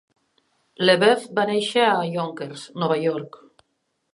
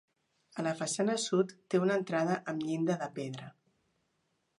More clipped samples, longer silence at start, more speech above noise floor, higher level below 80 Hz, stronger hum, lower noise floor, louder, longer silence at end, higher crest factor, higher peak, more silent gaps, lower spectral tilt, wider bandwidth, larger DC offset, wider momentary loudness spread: neither; first, 0.8 s vs 0.55 s; first, 52 dB vs 46 dB; first, -76 dBFS vs -82 dBFS; neither; second, -74 dBFS vs -79 dBFS; first, -21 LUFS vs -33 LUFS; second, 0.85 s vs 1.1 s; about the same, 20 dB vs 18 dB; first, -2 dBFS vs -16 dBFS; neither; about the same, -4.5 dB/octave vs -5 dB/octave; about the same, 11.5 kHz vs 11.5 kHz; neither; first, 16 LU vs 12 LU